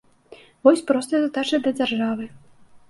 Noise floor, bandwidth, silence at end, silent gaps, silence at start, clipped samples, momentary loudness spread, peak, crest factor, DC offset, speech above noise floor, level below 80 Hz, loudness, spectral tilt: -49 dBFS; 12 kHz; 0.15 s; none; 0.3 s; under 0.1%; 9 LU; -2 dBFS; 22 dB; under 0.1%; 28 dB; -68 dBFS; -21 LUFS; -4.5 dB/octave